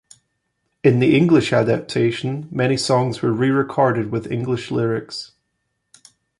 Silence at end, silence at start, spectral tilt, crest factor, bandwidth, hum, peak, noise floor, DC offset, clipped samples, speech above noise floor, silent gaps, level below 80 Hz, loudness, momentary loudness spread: 1.15 s; 0.85 s; -6.5 dB/octave; 18 dB; 11.5 kHz; none; -2 dBFS; -73 dBFS; under 0.1%; under 0.1%; 55 dB; none; -56 dBFS; -19 LUFS; 11 LU